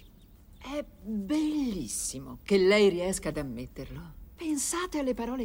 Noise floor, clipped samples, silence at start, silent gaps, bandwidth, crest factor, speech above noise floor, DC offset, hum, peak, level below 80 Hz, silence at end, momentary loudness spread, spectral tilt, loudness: -54 dBFS; under 0.1%; 0.05 s; none; 16.5 kHz; 18 dB; 25 dB; under 0.1%; none; -12 dBFS; -50 dBFS; 0 s; 19 LU; -4 dB/octave; -29 LUFS